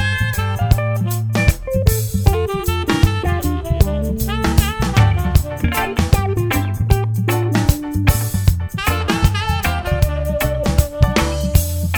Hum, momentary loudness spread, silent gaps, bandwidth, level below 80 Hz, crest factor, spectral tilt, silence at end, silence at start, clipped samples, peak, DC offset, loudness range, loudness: none; 3 LU; none; over 20 kHz; -22 dBFS; 16 dB; -5.5 dB/octave; 0 s; 0 s; under 0.1%; 0 dBFS; under 0.1%; 1 LU; -18 LUFS